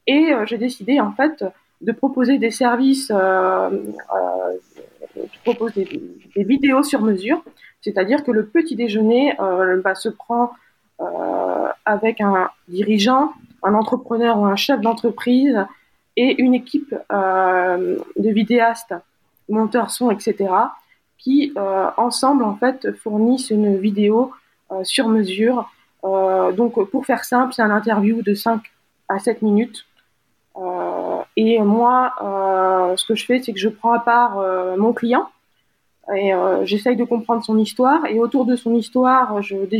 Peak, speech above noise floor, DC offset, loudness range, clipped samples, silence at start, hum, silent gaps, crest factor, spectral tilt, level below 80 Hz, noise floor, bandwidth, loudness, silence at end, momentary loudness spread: -2 dBFS; 49 dB; under 0.1%; 3 LU; under 0.1%; 0.05 s; none; none; 16 dB; -5 dB/octave; -68 dBFS; -67 dBFS; 15.5 kHz; -18 LUFS; 0 s; 10 LU